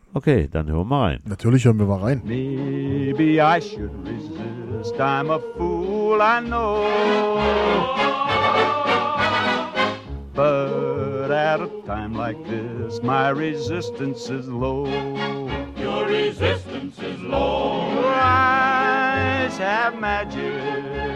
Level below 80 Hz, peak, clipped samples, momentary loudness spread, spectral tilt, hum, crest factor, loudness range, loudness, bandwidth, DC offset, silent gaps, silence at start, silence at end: -40 dBFS; -4 dBFS; under 0.1%; 12 LU; -6.5 dB/octave; none; 18 dB; 5 LU; -21 LUFS; 11 kHz; under 0.1%; none; 0.15 s; 0 s